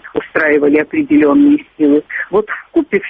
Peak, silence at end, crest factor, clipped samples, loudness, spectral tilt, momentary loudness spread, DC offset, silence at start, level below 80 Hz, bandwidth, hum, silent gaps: -2 dBFS; 0 s; 10 dB; under 0.1%; -13 LUFS; -9 dB/octave; 7 LU; under 0.1%; 0.05 s; -52 dBFS; 3.7 kHz; none; none